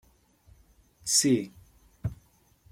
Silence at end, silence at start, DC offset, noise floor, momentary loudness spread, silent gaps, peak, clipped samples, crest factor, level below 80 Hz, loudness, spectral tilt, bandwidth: 0.6 s; 1.05 s; under 0.1%; -62 dBFS; 16 LU; none; -10 dBFS; under 0.1%; 22 dB; -56 dBFS; -27 LUFS; -3 dB/octave; 16.5 kHz